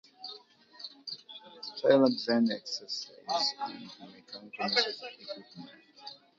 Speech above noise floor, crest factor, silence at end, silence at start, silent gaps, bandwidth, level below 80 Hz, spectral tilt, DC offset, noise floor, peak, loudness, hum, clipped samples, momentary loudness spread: 23 dB; 22 dB; 0.25 s; 0.2 s; none; 7.6 kHz; -82 dBFS; -4 dB/octave; under 0.1%; -54 dBFS; -10 dBFS; -30 LUFS; none; under 0.1%; 22 LU